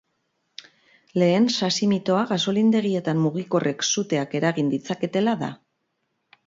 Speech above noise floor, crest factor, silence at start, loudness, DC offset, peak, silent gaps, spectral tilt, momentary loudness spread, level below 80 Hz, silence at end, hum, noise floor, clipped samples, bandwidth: 53 dB; 16 dB; 1.15 s; -23 LUFS; under 0.1%; -8 dBFS; none; -5 dB/octave; 7 LU; -68 dBFS; 0.95 s; none; -75 dBFS; under 0.1%; 7.8 kHz